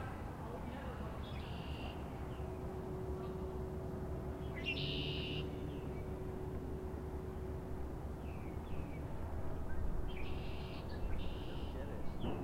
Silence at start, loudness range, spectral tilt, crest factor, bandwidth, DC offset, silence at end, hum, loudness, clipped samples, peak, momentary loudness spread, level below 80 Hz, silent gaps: 0 s; 3 LU; -7 dB/octave; 16 dB; 16 kHz; under 0.1%; 0 s; none; -44 LUFS; under 0.1%; -26 dBFS; 6 LU; -46 dBFS; none